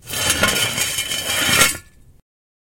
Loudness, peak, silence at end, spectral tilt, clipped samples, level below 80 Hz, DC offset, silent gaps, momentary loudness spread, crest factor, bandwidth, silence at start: -16 LUFS; 0 dBFS; 0.9 s; -1 dB/octave; under 0.1%; -44 dBFS; under 0.1%; none; 6 LU; 20 dB; 17 kHz; 0.05 s